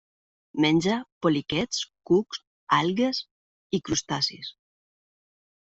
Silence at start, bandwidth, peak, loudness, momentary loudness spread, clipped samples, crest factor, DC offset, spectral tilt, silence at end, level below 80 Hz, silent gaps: 0.55 s; 8.2 kHz; -8 dBFS; -26 LUFS; 14 LU; under 0.1%; 20 dB; under 0.1%; -4.5 dB/octave; 1.2 s; -60 dBFS; 1.12-1.21 s, 2.47-2.67 s, 3.31-3.70 s